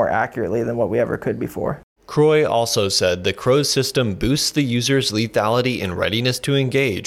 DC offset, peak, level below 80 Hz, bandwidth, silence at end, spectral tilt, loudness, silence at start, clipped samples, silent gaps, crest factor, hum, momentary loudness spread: under 0.1%; -6 dBFS; -46 dBFS; 16.5 kHz; 0 s; -4.5 dB/octave; -19 LUFS; 0 s; under 0.1%; 1.83-1.96 s; 12 dB; none; 7 LU